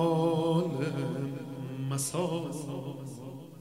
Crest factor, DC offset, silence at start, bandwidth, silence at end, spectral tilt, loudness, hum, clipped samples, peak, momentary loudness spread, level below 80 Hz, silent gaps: 16 dB; under 0.1%; 0 s; 16 kHz; 0 s; -6 dB/octave; -32 LUFS; none; under 0.1%; -16 dBFS; 14 LU; -72 dBFS; none